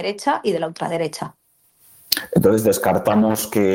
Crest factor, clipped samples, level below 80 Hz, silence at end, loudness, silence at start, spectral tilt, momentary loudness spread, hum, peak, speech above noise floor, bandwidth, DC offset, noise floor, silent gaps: 20 dB; under 0.1%; -56 dBFS; 0 s; -19 LUFS; 0 s; -5 dB/octave; 9 LU; none; 0 dBFS; 39 dB; 17 kHz; under 0.1%; -57 dBFS; none